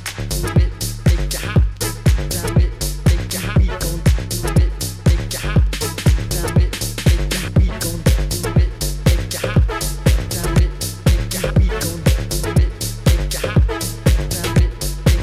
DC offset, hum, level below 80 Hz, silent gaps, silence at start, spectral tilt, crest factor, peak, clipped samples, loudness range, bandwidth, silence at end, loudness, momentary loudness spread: under 0.1%; none; -20 dBFS; none; 0 s; -5 dB/octave; 16 dB; 0 dBFS; under 0.1%; 0 LU; 16 kHz; 0 s; -18 LUFS; 3 LU